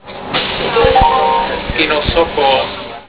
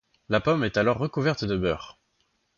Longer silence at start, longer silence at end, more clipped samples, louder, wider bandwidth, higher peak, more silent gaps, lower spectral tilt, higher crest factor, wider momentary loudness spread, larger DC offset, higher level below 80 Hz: second, 0.05 s vs 0.3 s; second, 0.05 s vs 0.65 s; neither; first, -13 LUFS vs -26 LUFS; second, 4 kHz vs 7.4 kHz; first, 0 dBFS vs -8 dBFS; neither; first, -8.5 dB/octave vs -6.5 dB/octave; second, 14 dB vs 20 dB; about the same, 7 LU vs 7 LU; first, 0.4% vs under 0.1%; first, -28 dBFS vs -50 dBFS